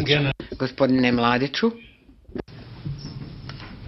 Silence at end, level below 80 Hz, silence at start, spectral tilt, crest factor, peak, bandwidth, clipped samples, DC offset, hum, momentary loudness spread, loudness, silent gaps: 0 s; -46 dBFS; 0 s; -7 dB/octave; 20 dB; -4 dBFS; 6 kHz; under 0.1%; under 0.1%; none; 19 LU; -22 LUFS; none